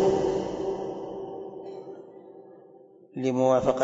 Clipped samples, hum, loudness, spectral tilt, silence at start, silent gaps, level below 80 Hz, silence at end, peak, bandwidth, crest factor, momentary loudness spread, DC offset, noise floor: under 0.1%; none; -28 LUFS; -6.5 dB/octave; 0 s; none; -58 dBFS; 0 s; -10 dBFS; 7.8 kHz; 18 dB; 24 LU; under 0.1%; -53 dBFS